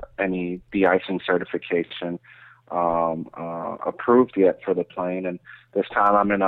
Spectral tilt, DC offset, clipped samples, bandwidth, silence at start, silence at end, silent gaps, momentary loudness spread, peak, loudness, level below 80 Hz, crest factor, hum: -9 dB/octave; under 0.1%; under 0.1%; 4.3 kHz; 0 s; 0 s; none; 13 LU; -6 dBFS; -23 LUFS; -56 dBFS; 16 dB; none